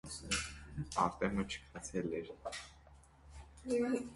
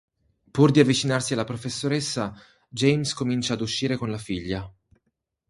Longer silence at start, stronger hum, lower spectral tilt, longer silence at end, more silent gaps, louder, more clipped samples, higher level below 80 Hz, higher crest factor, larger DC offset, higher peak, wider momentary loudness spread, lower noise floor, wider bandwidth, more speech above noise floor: second, 0.05 s vs 0.55 s; neither; about the same, -4 dB/octave vs -5 dB/octave; second, 0 s vs 0.8 s; neither; second, -39 LUFS vs -24 LUFS; neither; about the same, -56 dBFS vs -54 dBFS; about the same, 22 dB vs 22 dB; neither; second, -18 dBFS vs -2 dBFS; first, 19 LU vs 13 LU; second, -61 dBFS vs -77 dBFS; about the same, 11.5 kHz vs 11.5 kHz; second, 23 dB vs 53 dB